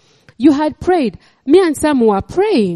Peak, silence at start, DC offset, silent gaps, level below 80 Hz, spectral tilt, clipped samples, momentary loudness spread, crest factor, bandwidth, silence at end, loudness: 0 dBFS; 0.4 s; under 0.1%; none; -44 dBFS; -6 dB/octave; under 0.1%; 5 LU; 14 dB; 13.5 kHz; 0 s; -14 LUFS